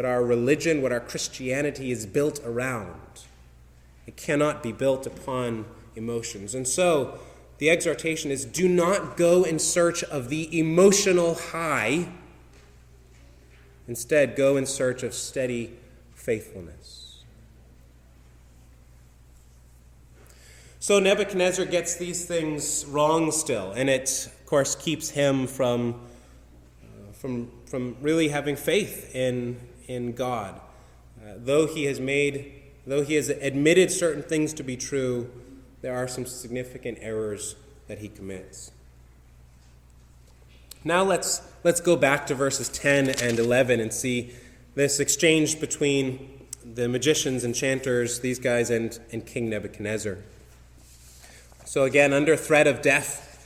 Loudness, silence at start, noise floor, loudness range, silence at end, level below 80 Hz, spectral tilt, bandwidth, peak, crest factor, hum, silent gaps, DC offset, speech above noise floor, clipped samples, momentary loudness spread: -25 LUFS; 0 s; -52 dBFS; 9 LU; 0.1 s; -54 dBFS; -4 dB/octave; 16.5 kHz; -6 dBFS; 20 dB; none; none; under 0.1%; 28 dB; under 0.1%; 17 LU